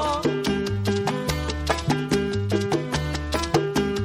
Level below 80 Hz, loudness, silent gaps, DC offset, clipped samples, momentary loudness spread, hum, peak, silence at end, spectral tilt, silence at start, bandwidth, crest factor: -36 dBFS; -24 LUFS; none; under 0.1%; under 0.1%; 3 LU; none; -6 dBFS; 0 s; -5.5 dB/octave; 0 s; 16 kHz; 18 dB